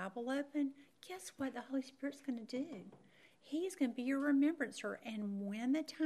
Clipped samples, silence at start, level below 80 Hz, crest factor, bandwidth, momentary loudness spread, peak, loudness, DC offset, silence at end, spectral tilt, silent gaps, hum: under 0.1%; 0 s; -88 dBFS; 16 dB; 13.5 kHz; 15 LU; -24 dBFS; -40 LUFS; under 0.1%; 0 s; -5 dB/octave; none; none